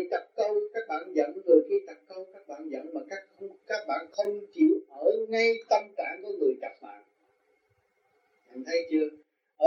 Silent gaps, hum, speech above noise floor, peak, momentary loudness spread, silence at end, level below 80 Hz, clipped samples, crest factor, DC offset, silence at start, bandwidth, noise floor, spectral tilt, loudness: none; none; 44 dB; -8 dBFS; 20 LU; 0 s; under -90 dBFS; under 0.1%; 20 dB; under 0.1%; 0 s; 7.2 kHz; -72 dBFS; -4 dB/octave; -29 LUFS